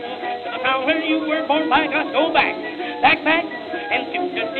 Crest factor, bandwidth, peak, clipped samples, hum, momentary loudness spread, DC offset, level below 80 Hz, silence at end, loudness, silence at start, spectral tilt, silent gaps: 20 dB; 4.7 kHz; 0 dBFS; under 0.1%; none; 10 LU; under 0.1%; -60 dBFS; 0 s; -19 LUFS; 0 s; -6 dB/octave; none